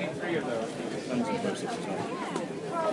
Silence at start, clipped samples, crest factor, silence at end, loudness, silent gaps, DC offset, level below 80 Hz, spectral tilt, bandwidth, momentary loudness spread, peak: 0 s; under 0.1%; 14 dB; 0 s; -32 LUFS; none; under 0.1%; -74 dBFS; -5 dB/octave; 11.5 kHz; 4 LU; -18 dBFS